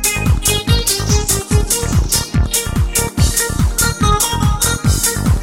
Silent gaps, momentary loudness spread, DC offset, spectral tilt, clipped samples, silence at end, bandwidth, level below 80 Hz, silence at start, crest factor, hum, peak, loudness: none; 2 LU; under 0.1%; -3.5 dB/octave; under 0.1%; 0 s; 16.5 kHz; -20 dBFS; 0 s; 14 dB; none; 0 dBFS; -14 LUFS